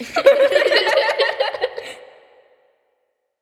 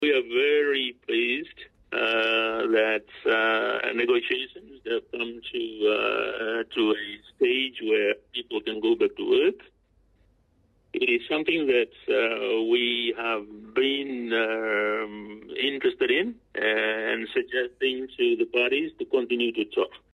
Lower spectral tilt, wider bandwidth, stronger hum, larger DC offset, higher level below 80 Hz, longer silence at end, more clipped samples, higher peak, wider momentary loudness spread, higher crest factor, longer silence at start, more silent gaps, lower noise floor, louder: second, -1.5 dB/octave vs -4.5 dB/octave; first, 14 kHz vs 6 kHz; neither; neither; about the same, -66 dBFS vs -66 dBFS; first, 1.45 s vs 0.2 s; neither; first, 0 dBFS vs -12 dBFS; first, 14 LU vs 8 LU; first, 20 dB vs 14 dB; about the same, 0 s vs 0 s; neither; first, -70 dBFS vs -65 dBFS; first, -16 LUFS vs -25 LUFS